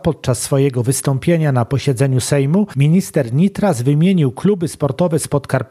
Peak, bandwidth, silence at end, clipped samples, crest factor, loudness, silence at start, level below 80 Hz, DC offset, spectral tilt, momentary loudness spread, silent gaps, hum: 0 dBFS; 15 kHz; 0.05 s; under 0.1%; 14 dB; -16 LUFS; 0.05 s; -46 dBFS; under 0.1%; -6.5 dB/octave; 4 LU; none; none